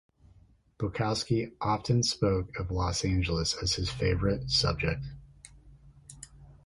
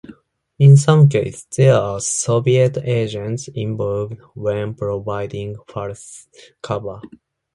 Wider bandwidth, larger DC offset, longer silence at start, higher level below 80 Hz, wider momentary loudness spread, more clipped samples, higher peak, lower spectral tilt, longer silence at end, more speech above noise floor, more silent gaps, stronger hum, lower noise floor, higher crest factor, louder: about the same, 11.5 kHz vs 11.5 kHz; neither; first, 0.8 s vs 0.1 s; first, -42 dBFS vs -50 dBFS; about the same, 18 LU vs 18 LU; neither; second, -12 dBFS vs 0 dBFS; second, -4.5 dB/octave vs -6.5 dB/octave; second, 0.15 s vs 0.5 s; about the same, 31 dB vs 32 dB; neither; neither; first, -61 dBFS vs -49 dBFS; about the same, 18 dB vs 18 dB; second, -29 LUFS vs -17 LUFS